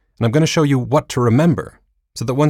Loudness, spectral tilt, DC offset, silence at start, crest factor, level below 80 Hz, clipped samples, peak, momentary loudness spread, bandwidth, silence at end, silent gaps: -17 LUFS; -6.5 dB/octave; under 0.1%; 0.2 s; 14 dB; -48 dBFS; under 0.1%; -2 dBFS; 13 LU; 15.5 kHz; 0 s; none